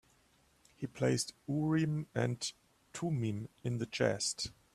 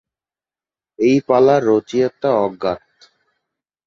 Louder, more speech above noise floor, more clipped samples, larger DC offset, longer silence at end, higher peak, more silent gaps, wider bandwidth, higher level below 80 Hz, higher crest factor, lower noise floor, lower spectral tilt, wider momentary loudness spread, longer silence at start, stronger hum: second, -36 LUFS vs -16 LUFS; second, 35 dB vs over 75 dB; neither; neither; second, 0.2 s vs 1.1 s; second, -16 dBFS vs -2 dBFS; neither; first, 13.5 kHz vs 7.4 kHz; second, -66 dBFS vs -58 dBFS; about the same, 20 dB vs 16 dB; second, -70 dBFS vs under -90 dBFS; second, -5 dB/octave vs -7 dB/octave; about the same, 9 LU vs 11 LU; second, 0.8 s vs 1 s; neither